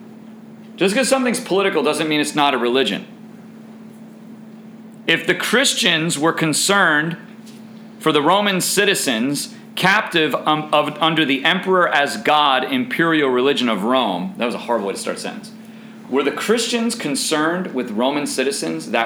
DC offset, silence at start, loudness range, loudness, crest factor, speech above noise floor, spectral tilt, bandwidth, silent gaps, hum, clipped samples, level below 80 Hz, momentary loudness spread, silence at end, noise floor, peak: under 0.1%; 0 s; 5 LU; -17 LUFS; 18 dB; 21 dB; -3 dB/octave; over 20 kHz; none; none; under 0.1%; -70 dBFS; 10 LU; 0 s; -39 dBFS; -2 dBFS